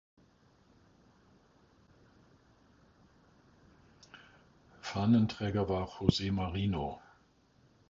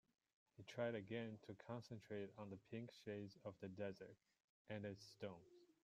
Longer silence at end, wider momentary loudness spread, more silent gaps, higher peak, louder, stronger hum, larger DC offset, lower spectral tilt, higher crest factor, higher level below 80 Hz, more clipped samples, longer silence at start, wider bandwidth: first, 0.95 s vs 0.25 s; first, 27 LU vs 10 LU; second, none vs 4.44-4.65 s; first, -10 dBFS vs -32 dBFS; first, -33 LUFS vs -53 LUFS; neither; neither; about the same, -6.5 dB/octave vs -6.5 dB/octave; about the same, 26 dB vs 22 dB; first, -54 dBFS vs -88 dBFS; neither; first, 4.15 s vs 0.6 s; second, 7.4 kHz vs 15 kHz